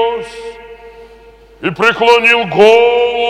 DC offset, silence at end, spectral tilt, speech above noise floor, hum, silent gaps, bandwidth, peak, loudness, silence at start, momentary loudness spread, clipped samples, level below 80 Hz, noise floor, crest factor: under 0.1%; 0 s; -4 dB/octave; 29 dB; none; none; 11.5 kHz; 0 dBFS; -9 LUFS; 0 s; 20 LU; 0.3%; -46 dBFS; -40 dBFS; 12 dB